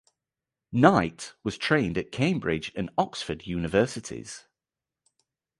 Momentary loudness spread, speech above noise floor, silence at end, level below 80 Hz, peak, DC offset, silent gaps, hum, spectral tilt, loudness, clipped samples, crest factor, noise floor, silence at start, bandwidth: 16 LU; 64 dB; 1.2 s; -52 dBFS; -4 dBFS; under 0.1%; none; none; -5.5 dB/octave; -26 LUFS; under 0.1%; 24 dB; -90 dBFS; 0.7 s; 11.5 kHz